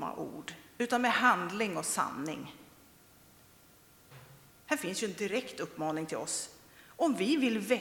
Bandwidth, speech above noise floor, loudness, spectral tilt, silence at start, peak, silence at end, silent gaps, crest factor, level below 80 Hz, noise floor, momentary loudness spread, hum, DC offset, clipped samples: 19 kHz; 28 dB; -32 LUFS; -3.5 dB/octave; 0 s; -12 dBFS; 0 s; none; 24 dB; -74 dBFS; -60 dBFS; 16 LU; none; under 0.1%; under 0.1%